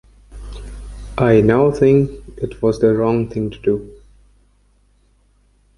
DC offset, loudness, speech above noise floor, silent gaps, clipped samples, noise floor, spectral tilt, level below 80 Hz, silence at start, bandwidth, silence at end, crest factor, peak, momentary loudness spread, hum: under 0.1%; -16 LUFS; 41 dB; none; under 0.1%; -56 dBFS; -8.5 dB/octave; -38 dBFS; 0.35 s; 11.5 kHz; 1.85 s; 16 dB; -2 dBFS; 22 LU; 50 Hz at -40 dBFS